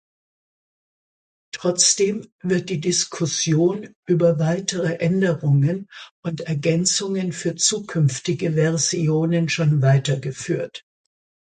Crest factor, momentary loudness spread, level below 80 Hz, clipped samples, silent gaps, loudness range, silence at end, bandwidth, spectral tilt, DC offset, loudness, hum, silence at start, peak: 20 dB; 10 LU; -62 dBFS; under 0.1%; 2.32-2.39 s, 3.95-4.03 s, 6.11-6.23 s; 2 LU; 0.75 s; 9.6 kHz; -4.5 dB/octave; under 0.1%; -20 LUFS; none; 1.55 s; -2 dBFS